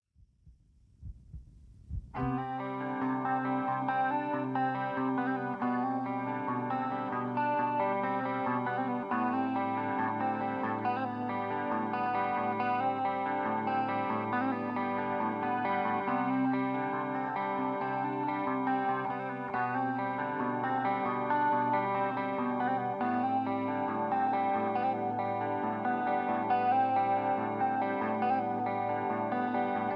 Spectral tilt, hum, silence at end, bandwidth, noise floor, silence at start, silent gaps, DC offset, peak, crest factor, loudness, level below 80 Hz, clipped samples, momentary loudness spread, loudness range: -9 dB/octave; none; 0 s; 5.4 kHz; -62 dBFS; 0.45 s; none; under 0.1%; -18 dBFS; 14 dB; -32 LUFS; -60 dBFS; under 0.1%; 4 LU; 2 LU